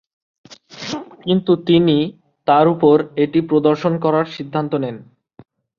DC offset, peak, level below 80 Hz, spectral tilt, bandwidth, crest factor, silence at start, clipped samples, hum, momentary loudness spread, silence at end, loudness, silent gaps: under 0.1%; -2 dBFS; -58 dBFS; -7.5 dB/octave; 7.2 kHz; 16 dB; 0.5 s; under 0.1%; none; 14 LU; 0.75 s; -17 LUFS; none